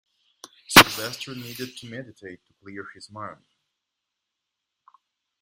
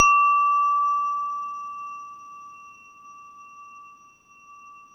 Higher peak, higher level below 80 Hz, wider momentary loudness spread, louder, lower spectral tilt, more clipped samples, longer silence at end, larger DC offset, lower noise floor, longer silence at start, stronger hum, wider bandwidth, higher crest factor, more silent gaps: about the same, 0 dBFS vs -2 dBFS; first, -52 dBFS vs -66 dBFS; about the same, 27 LU vs 27 LU; first, -16 LUFS vs -22 LUFS; first, -2 dB/octave vs 1.5 dB/octave; neither; first, 2.1 s vs 0.15 s; neither; first, -83 dBFS vs -53 dBFS; first, 0.7 s vs 0 s; neither; first, 16.5 kHz vs 6.2 kHz; about the same, 26 dB vs 22 dB; neither